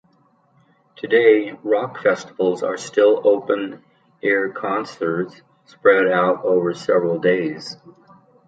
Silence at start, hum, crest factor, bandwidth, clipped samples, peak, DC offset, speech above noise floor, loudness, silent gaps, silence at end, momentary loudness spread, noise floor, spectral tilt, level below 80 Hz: 1.05 s; none; 18 dB; 9 kHz; under 0.1%; -2 dBFS; under 0.1%; 40 dB; -19 LUFS; none; 0.75 s; 11 LU; -59 dBFS; -5.5 dB/octave; -70 dBFS